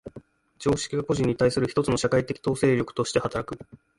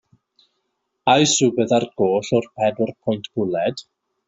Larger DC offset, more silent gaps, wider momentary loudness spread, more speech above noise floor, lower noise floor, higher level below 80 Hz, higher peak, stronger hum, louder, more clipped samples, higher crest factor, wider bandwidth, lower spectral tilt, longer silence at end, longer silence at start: neither; neither; about the same, 9 LU vs 9 LU; second, 24 dB vs 55 dB; second, -49 dBFS vs -74 dBFS; first, -50 dBFS vs -62 dBFS; second, -10 dBFS vs -2 dBFS; neither; second, -25 LUFS vs -20 LUFS; neither; about the same, 16 dB vs 18 dB; first, 11.5 kHz vs 8.2 kHz; first, -5.5 dB/octave vs -4 dB/octave; about the same, 0.35 s vs 0.45 s; second, 0.05 s vs 1.05 s